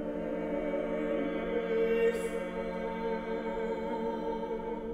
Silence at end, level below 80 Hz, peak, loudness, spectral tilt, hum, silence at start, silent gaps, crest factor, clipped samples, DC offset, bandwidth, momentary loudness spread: 0 s; -52 dBFS; -18 dBFS; -33 LUFS; -6.5 dB/octave; none; 0 s; none; 14 dB; under 0.1%; under 0.1%; 13.5 kHz; 7 LU